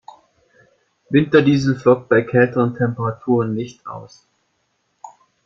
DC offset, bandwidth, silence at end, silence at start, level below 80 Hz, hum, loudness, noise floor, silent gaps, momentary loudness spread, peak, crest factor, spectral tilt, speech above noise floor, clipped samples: under 0.1%; 7.6 kHz; 0.35 s; 1.1 s; -56 dBFS; none; -17 LUFS; -68 dBFS; none; 16 LU; -2 dBFS; 18 dB; -7.5 dB/octave; 51 dB; under 0.1%